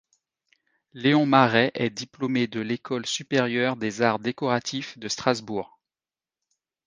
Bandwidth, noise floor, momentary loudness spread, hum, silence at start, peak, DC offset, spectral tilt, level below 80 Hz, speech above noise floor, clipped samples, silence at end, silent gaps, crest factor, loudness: 10 kHz; under -90 dBFS; 13 LU; none; 0.95 s; -2 dBFS; under 0.1%; -5 dB/octave; -68 dBFS; over 66 dB; under 0.1%; 1.2 s; none; 24 dB; -24 LUFS